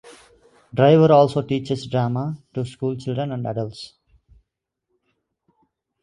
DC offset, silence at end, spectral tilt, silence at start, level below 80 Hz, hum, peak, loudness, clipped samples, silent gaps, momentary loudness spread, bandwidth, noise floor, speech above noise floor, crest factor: under 0.1%; 2.15 s; -8 dB/octave; 0.05 s; -58 dBFS; none; -2 dBFS; -20 LUFS; under 0.1%; none; 16 LU; 11 kHz; -79 dBFS; 60 dB; 20 dB